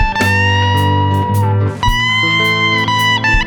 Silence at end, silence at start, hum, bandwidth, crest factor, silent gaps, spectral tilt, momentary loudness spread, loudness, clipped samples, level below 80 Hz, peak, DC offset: 0 s; 0 s; none; 20 kHz; 12 dB; none; -4.5 dB/octave; 3 LU; -12 LUFS; under 0.1%; -24 dBFS; 0 dBFS; under 0.1%